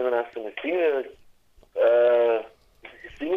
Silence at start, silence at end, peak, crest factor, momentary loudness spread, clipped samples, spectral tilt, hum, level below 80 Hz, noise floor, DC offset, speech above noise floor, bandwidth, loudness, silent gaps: 0 s; 0 s; -10 dBFS; 16 dB; 20 LU; under 0.1%; -5.5 dB/octave; none; -60 dBFS; -56 dBFS; under 0.1%; 33 dB; 5.2 kHz; -23 LUFS; none